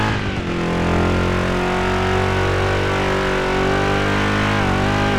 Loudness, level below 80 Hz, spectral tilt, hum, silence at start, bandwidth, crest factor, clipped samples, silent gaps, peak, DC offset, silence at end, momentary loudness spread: -18 LUFS; -30 dBFS; -6 dB/octave; none; 0 s; 13.5 kHz; 12 dB; under 0.1%; none; -6 dBFS; under 0.1%; 0 s; 2 LU